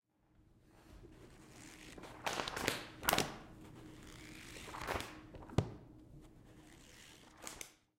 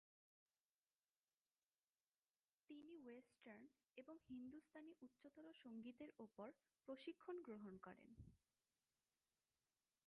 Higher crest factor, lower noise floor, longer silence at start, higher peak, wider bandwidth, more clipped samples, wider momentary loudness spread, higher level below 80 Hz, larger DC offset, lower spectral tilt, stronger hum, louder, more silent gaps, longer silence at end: first, 32 dB vs 20 dB; second, -70 dBFS vs under -90 dBFS; second, 0.4 s vs 2.7 s; first, -12 dBFS vs -44 dBFS; first, 16 kHz vs 4 kHz; neither; first, 22 LU vs 10 LU; first, -60 dBFS vs -86 dBFS; neither; second, -3.5 dB/octave vs -5 dB/octave; neither; first, -41 LUFS vs -61 LUFS; neither; second, 0.25 s vs 1.7 s